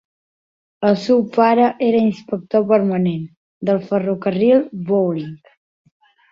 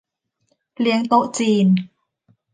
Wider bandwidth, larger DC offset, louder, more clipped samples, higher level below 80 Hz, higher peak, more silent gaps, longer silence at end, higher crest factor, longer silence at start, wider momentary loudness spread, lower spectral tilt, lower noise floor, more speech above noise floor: second, 7.4 kHz vs 9.6 kHz; neither; about the same, -17 LUFS vs -18 LUFS; neither; first, -62 dBFS vs -70 dBFS; about the same, -2 dBFS vs -4 dBFS; first, 3.37-3.61 s vs none; first, 0.95 s vs 0.65 s; about the same, 16 dB vs 18 dB; about the same, 0.8 s vs 0.8 s; first, 12 LU vs 6 LU; first, -8.5 dB/octave vs -6 dB/octave; first, under -90 dBFS vs -69 dBFS; first, over 73 dB vs 52 dB